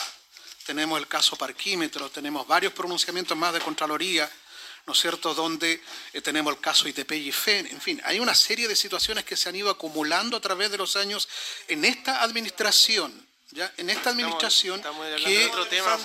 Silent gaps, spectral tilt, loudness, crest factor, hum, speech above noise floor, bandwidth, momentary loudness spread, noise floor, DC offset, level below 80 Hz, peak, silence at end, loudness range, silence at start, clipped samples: none; -0.5 dB/octave; -24 LUFS; 20 dB; none; 22 dB; 16.5 kHz; 12 LU; -48 dBFS; under 0.1%; -66 dBFS; -6 dBFS; 0 s; 3 LU; 0 s; under 0.1%